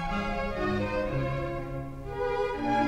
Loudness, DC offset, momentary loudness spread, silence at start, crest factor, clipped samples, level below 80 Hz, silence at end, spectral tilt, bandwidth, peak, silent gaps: -31 LUFS; under 0.1%; 7 LU; 0 s; 14 dB; under 0.1%; -40 dBFS; 0 s; -7 dB/octave; 15 kHz; -16 dBFS; none